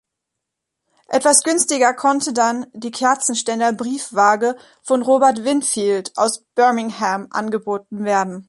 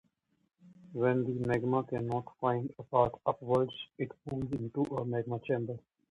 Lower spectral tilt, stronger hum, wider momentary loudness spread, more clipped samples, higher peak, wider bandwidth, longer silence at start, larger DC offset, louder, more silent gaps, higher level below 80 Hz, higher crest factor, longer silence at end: second, -2.5 dB/octave vs -8.5 dB/octave; neither; about the same, 9 LU vs 10 LU; neither; first, 0 dBFS vs -12 dBFS; first, 12 kHz vs 10.5 kHz; first, 1.1 s vs 0.65 s; neither; first, -18 LUFS vs -33 LUFS; neither; about the same, -68 dBFS vs -64 dBFS; about the same, 18 dB vs 22 dB; second, 0.05 s vs 0.3 s